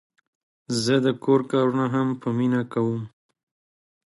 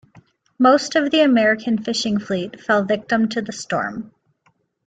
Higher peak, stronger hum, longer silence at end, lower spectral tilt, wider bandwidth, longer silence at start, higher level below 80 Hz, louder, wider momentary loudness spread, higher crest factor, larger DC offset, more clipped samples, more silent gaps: second, -6 dBFS vs -2 dBFS; neither; first, 1 s vs 0.8 s; first, -6 dB/octave vs -4.5 dB/octave; first, 11.5 kHz vs 9.2 kHz; about the same, 0.7 s vs 0.6 s; about the same, -66 dBFS vs -62 dBFS; second, -23 LUFS vs -19 LUFS; second, 7 LU vs 10 LU; about the same, 18 dB vs 18 dB; neither; neither; neither